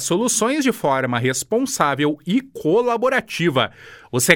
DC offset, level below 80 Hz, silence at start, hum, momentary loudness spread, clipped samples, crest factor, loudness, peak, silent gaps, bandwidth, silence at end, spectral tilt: under 0.1%; -58 dBFS; 0 s; none; 4 LU; under 0.1%; 20 dB; -20 LUFS; 0 dBFS; none; 19 kHz; 0 s; -4 dB/octave